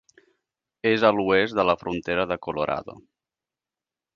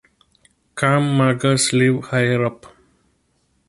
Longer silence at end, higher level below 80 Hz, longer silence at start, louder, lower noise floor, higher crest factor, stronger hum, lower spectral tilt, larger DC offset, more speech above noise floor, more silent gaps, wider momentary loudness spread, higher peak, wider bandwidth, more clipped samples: first, 1.15 s vs 1 s; about the same, -56 dBFS vs -56 dBFS; about the same, 0.85 s vs 0.75 s; second, -23 LUFS vs -18 LUFS; first, under -90 dBFS vs -65 dBFS; about the same, 22 dB vs 18 dB; neither; first, -6.5 dB/octave vs -5 dB/octave; neither; first, over 67 dB vs 47 dB; neither; about the same, 8 LU vs 6 LU; about the same, -4 dBFS vs -2 dBFS; second, 7.2 kHz vs 11.5 kHz; neither